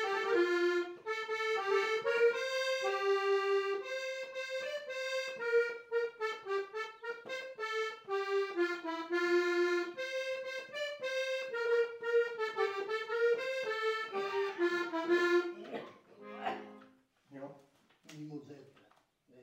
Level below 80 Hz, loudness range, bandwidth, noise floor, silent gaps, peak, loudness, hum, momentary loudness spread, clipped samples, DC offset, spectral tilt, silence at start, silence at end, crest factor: -88 dBFS; 5 LU; 16 kHz; -69 dBFS; none; -18 dBFS; -35 LUFS; none; 14 LU; under 0.1%; under 0.1%; -3.5 dB/octave; 0 s; 0 s; 16 dB